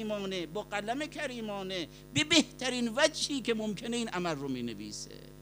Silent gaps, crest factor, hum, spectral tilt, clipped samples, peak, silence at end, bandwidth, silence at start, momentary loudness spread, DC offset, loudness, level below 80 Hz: none; 24 dB; 50 Hz at -55 dBFS; -3 dB/octave; under 0.1%; -10 dBFS; 0 s; 15.5 kHz; 0 s; 12 LU; under 0.1%; -32 LUFS; -60 dBFS